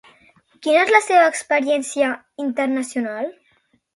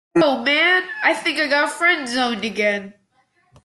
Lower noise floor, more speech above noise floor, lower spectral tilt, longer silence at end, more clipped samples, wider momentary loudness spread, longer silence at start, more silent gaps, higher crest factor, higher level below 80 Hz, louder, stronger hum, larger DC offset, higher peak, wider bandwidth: about the same, -62 dBFS vs -63 dBFS; about the same, 44 dB vs 44 dB; about the same, -2 dB/octave vs -3 dB/octave; about the same, 0.65 s vs 0.75 s; neither; first, 13 LU vs 6 LU; first, 0.6 s vs 0.15 s; neither; about the same, 20 dB vs 16 dB; second, -72 dBFS vs -64 dBFS; about the same, -19 LUFS vs -18 LUFS; neither; neither; first, 0 dBFS vs -4 dBFS; about the same, 11.5 kHz vs 12.5 kHz